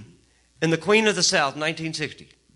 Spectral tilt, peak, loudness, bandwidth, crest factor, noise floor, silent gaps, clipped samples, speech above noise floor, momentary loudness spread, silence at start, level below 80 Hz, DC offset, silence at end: -3 dB/octave; -6 dBFS; -22 LUFS; 11.5 kHz; 18 dB; -57 dBFS; none; under 0.1%; 35 dB; 11 LU; 0 s; -62 dBFS; under 0.1%; 0.35 s